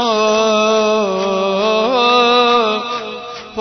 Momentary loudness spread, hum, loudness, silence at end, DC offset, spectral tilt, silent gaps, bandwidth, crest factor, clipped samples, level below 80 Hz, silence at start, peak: 12 LU; none; -14 LUFS; 0 s; under 0.1%; -3.5 dB/octave; none; 6.4 kHz; 12 dB; under 0.1%; -56 dBFS; 0 s; -2 dBFS